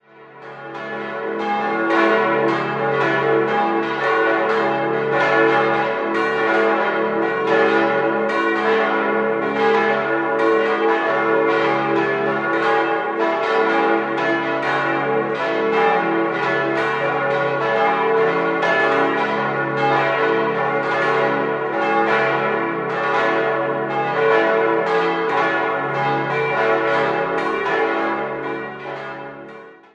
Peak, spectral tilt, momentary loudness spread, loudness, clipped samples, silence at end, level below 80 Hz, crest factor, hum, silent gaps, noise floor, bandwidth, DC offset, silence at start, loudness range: -2 dBFS; -6 dB/octave; 5 LU; -18 LUFS; under 0.1%; 0.2 s; -62 dBFS; 16 dB; none; none; -40 dBFS; 8 kHz; under 0.1%; 0.2 s; 1 LU